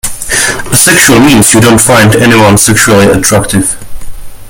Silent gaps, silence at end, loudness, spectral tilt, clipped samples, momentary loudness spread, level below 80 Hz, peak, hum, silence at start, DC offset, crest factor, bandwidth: none; 0 s; -4 LUFS; -3.5 dB/octave; 6%; 7 LU; -26 dBFS; 0 dBFS; none; 0.05 s; under 0.1%; 6 dB; over 20 kHz